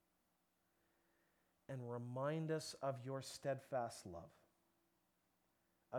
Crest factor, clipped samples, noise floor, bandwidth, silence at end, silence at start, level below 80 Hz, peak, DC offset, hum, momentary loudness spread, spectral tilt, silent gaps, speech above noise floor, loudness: 20 dB; under 0.1%; -84 dBFS; 19.5 kHz; 0 s; 1.7 s; -84 dBFS; -30 dBFS; under 0.1%; none; 11 LU; -5.5 dB/octave; none; 38 dB; -46 LUFS